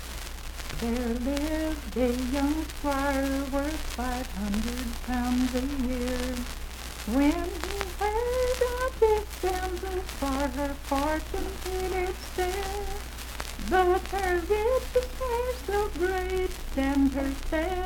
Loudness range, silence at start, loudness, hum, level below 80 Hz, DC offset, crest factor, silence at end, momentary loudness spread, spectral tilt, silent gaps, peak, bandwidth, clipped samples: 3 LU; 0 s; -29 LUFS; none; -36 dBFS; under 0.1%; 18 dB; 0 s; 9 LU; -5 dB/octave; none; -10 dBFS; 19 kHz; under 0.1%